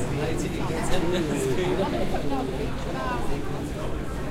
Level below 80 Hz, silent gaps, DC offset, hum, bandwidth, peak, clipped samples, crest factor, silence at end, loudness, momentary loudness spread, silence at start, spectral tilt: -34 dBFS; none; under 0.1%; none; 15.5 kHz; -8 dBFS; under 0.1%; 16 dB; 0 s; -28 LUFS; 6 LU; 0 s; -5.5 dB/octave